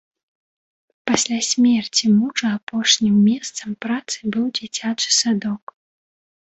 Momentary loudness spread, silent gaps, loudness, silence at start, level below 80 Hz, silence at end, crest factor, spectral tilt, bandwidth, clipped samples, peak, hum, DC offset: 10 LU; 2.63-2.67 s; -19 LUFS; 1.05 s; -62 dBFS; 0.9 s; 18 dB; -3 dB/octave; 8.2 kHz; under 0.1%; -2 dBFS; none; under 0.1%